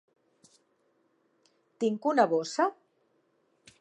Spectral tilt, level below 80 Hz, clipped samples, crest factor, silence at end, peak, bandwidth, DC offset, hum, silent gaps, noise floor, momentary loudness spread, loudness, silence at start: -4.5 dB/octave; -88 dBFS; under 0.1%; 24 dB; 1.1 s; -10 dBFS; 10.5 kHz; under 0.1%; none; none; -72 dBFS; 6 LU; -28 LUFS; 1.8 s